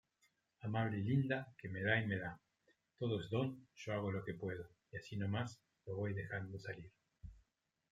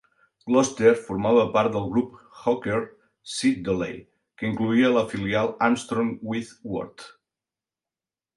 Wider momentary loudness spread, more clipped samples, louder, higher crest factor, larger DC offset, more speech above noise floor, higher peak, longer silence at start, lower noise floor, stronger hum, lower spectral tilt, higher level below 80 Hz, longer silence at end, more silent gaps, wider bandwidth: first, 18 LU vs 13 LU; neither; second, -42 LUFS vs -24 LUFS; about the same, 22 dB vs 20 dB; neither; second, 44 dB vs over 67 dB; second, -20 dBFS vs -6 dBFS; first, 0.6 s vs 0.45 s; second, -84 dBFS vs under -90 dBFS; neither; first, -7 dB/octave vs -5.5 dB/octave; second, -70 dBFS vs -56 dBFS; second, 0.55 s vs 1.3 s; neither; second, 7.8 kHz vs 11.5 kHz